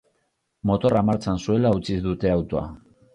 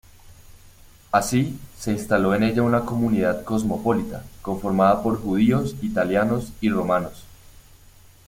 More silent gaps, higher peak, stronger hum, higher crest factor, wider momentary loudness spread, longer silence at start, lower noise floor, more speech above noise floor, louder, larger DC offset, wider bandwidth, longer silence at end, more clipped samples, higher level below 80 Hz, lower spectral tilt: neither; second, -8 dBFS vs -4 dBFS; neither; about the same, 16 dB vs 18 dB; about the same, 9 LU vs 9 LU; first, 0.65 s vs 0.25 s; first, -72 dBFS vs -50 dBFS; first, 50 dB vs 28 dB; about the same, -23 LUFS vs -22 LUFS; neither; second, 10.5 kHz vs 16.5 kHz; second, 0.4 s vs 0.95 s; neither; about the same, -42 dBFS vs -46 dBFS; first, -8 dB/octave vs -6.5 dB/octave